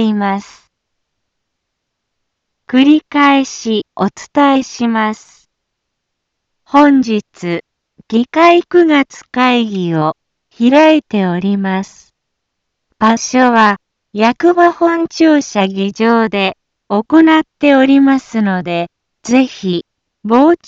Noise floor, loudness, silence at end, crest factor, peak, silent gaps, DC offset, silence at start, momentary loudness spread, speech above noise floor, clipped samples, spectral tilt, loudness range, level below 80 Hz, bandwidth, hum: -74 dBFS; -12 LUFS; 0.15 s; 12 dB; 0 dBFS; none; under 0.1%; 0 s; 11 LU; 62 dB; under 0.1%; -5.5 dB/octave; 4 LU; -56 dBFS; 7.8 kHz; none